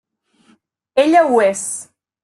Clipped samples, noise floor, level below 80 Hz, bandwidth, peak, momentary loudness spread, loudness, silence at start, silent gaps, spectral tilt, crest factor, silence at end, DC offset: under 0.1%; -57 dBFS; -68 dBFS; 12.5 kHz; -2 dBFS; 13 LU; -15 LUFS; 0.95 s; none; -3 dB/octave; 16 dB; 0.4 s; under 0.1%